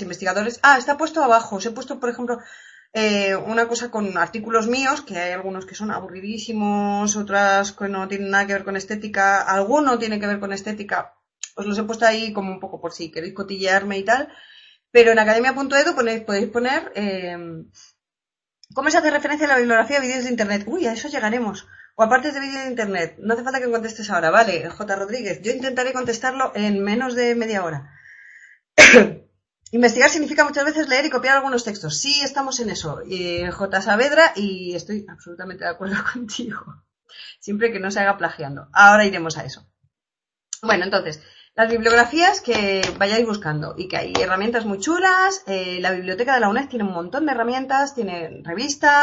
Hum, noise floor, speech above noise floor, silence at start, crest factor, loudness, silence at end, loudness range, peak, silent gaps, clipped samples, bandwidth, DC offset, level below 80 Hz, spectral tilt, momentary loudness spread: none; -90 dBFS; 70 dB; 0 s; 20 dB; -19 LUFS; 0 s; 8 LU; 0 dBFS; none; under 0.1%; 8.6 kHz; under 0.1%; -56 dBFS; -3.5 dB/octave; 15 LU